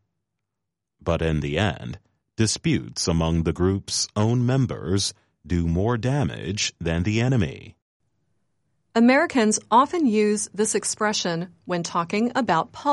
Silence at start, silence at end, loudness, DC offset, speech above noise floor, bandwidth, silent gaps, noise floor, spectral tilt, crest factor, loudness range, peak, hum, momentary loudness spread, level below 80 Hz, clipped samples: 1.05 s; 0 s; -23 LUFS; under 0.1%; 61 dB; 11.5 kHz; 7.82-8.00 s; -84 dBFS; -5 dB/octave; 18 dB; 4 LU; -6 dBFS; none; 9 LU; -42 dBFS; under 0.1%